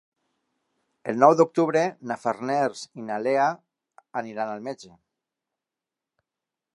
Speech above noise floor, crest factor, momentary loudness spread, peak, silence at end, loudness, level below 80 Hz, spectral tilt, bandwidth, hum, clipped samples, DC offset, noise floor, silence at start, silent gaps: 65 dB; 24 dB; 18 LU; -2 dBFS; 1.85 s; -24 LUFS; -80 dBFS; -6 dB/octave; 11 kHz; none; under 0.1%; under 0.1%; -88 dBFS; 1.05 s; none